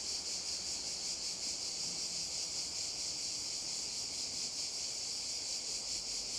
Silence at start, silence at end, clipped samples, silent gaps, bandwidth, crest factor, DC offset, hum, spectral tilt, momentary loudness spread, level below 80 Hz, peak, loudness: 0 s; 0 s; under 0.1%; none; over 20 kHz; 14 dB; under 0.1%; none; 1 dB/octave; 1 LU; -66 dBFS; -26 dBFS; -37 LUFS